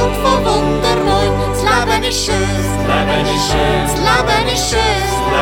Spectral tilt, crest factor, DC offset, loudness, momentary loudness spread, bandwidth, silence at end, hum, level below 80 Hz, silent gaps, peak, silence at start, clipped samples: -4 dB/octave; 14 dB; under 0.1%; -14 LUFS; 3 LU; 18 kHz; 0 s; none; -24 dBFS; none; 0 dBFS; 0 s; under 0.1%